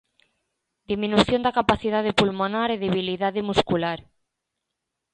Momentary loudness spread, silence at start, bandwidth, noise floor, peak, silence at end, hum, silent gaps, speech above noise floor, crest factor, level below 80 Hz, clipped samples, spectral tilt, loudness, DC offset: 7 LU; 0.9 s; 10 kHz; -82 dBFS; -2 dBFS; 1.15 s; none; none; 60 dB; 22 dB; -50 dBFS; under 0.1%; -5.5 dB/octave; -23 LUFS; under 0.1%